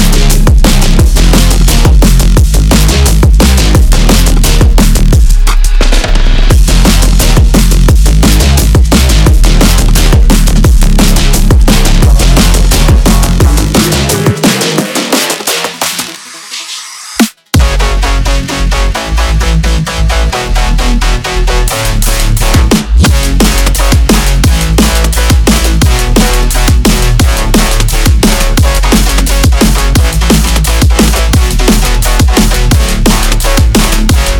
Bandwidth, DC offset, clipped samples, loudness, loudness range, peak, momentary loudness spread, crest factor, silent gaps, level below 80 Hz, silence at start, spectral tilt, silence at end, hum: 18.5 kHz; under 0.1%; 2%; -8 LUFS; 4 LU; 0 dBFS; 5 LU; 6 dB; none; -8 dBFS; 0 s; -4.5 dB/octave; 0 s; none